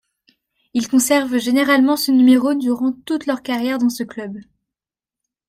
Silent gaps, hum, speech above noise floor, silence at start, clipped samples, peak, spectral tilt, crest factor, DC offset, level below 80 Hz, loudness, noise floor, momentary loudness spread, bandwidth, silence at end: none; none; 72 dB; 0.75 s; under 0.1%; -2 dBFS; -3 dB/octave; 16 dB; under 0.1%; -62 dBFS; -17 LUFS; -88 dBFS; 14 LU; 16 kHz; 1.05 s